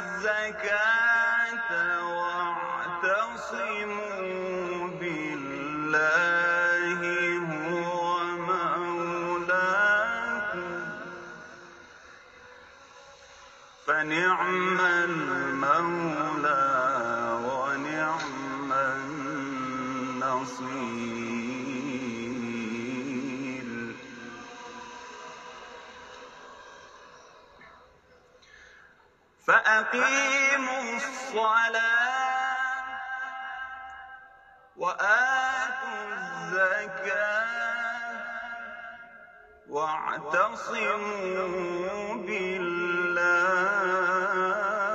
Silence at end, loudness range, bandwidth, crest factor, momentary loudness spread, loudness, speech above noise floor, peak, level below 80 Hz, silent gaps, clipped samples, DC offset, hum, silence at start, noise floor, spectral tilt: 0 s; 11 LU; 8.8 kHz; 20 dB; 19 LU; -27 LUFS; 34 dB; -8 dBFS; -68 dBFS; none; under 0.1%; under 0.1%; none; 0 s; -61 dBFS; -4 dB/octave